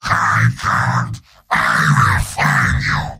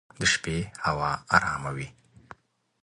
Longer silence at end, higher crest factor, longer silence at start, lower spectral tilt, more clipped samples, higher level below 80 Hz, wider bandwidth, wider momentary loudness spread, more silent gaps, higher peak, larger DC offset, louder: second, 0 s vs 0.9 s; second, 14 dB vs 26 dB; second, 0.05 s vs 0.2 s; first, -4.5 dB/octave vs -3 dB/octave; neither; first, -32 dBFS vs -50 dBFS; first, 16 kHz vs 11 kHz; second, 7 LU vs 12 LU; neither; first, 0 dBFS vs -4 dBFS; neither; first, -15 LUFS vs -26 LUFS